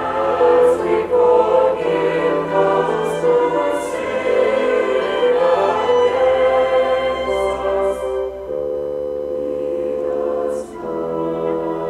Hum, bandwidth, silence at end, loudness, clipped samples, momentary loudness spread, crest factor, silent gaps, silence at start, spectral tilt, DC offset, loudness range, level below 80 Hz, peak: 50 Hz at -55 dBFS; 12 kHz; 0 s; -18 LUFS; under 0.1%; 9 LU; 14 dB; none; 0 s; -5.5 dB/octave; under 0.1%; 6 LU; -46 dBFS; -4 dBFS